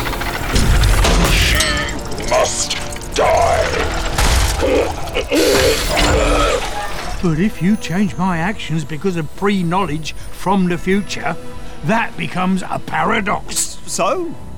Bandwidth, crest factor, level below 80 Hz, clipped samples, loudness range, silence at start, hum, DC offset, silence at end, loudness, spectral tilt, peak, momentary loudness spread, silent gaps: over 20 kHz; 14 dB; -24 dBFS; under 0.1%; 4 LU; 0 s; none; 5%; 0 s; -17 LUFS; -4 dB/octave; -2 dBFS; 9 LU; none